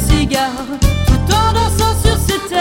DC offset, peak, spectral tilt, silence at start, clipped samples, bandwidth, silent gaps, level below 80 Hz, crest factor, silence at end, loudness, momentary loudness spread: under 0.1%; 0 dBFS; -5 dB/octave; 0 s; under 0.1%; 17 kHz; none; -18 dBFS; 12 dB; 0 s; -14 LUFS; 4 LU